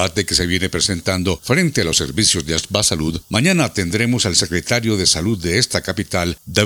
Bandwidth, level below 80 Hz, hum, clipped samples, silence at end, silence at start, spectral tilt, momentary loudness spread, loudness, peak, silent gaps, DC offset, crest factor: over 20 kHz; -40 dBFS; none; under 0.1%; 0 s; 0 s; -3.5 dB/octave; 5 LU; -17 LUFS; 0 dBFS; none; under 0.1%; 18 dB